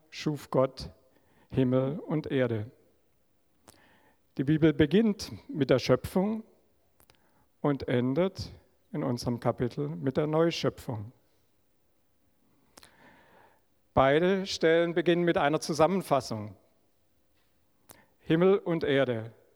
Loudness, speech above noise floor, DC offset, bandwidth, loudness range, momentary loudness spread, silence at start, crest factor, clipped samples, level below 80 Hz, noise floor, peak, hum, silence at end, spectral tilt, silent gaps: -28 LUFS; 45 dB; under 0.1%; 17 kHz; 6 LU; 14 LU; 0.15 s; 20 dB; under 0.1%; -58 dBFS; -73 dBFS; -10 dBFS; none; 0.25 s; -6.5 dB/octave; none